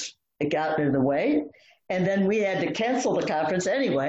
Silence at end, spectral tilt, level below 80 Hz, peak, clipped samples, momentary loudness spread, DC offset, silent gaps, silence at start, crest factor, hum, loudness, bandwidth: 0 s; -5.5 dB/octave; -62 dBFS; -12 dBFS; under 0.1%; 6 LU; under 0.1%; none; 0 s; 12 dB; none; -25 LUFS; 8.4 kHz